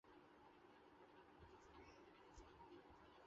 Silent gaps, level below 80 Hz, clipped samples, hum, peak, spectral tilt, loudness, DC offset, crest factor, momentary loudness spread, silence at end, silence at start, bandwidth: none; -76 dBFS; under 0.1%; none; -50 dBFS; -4 dB/octave; -67 LUFS; under 0.1%; 16 dB; 4 LU; 0 s; 0.05 s; 7.4 kHz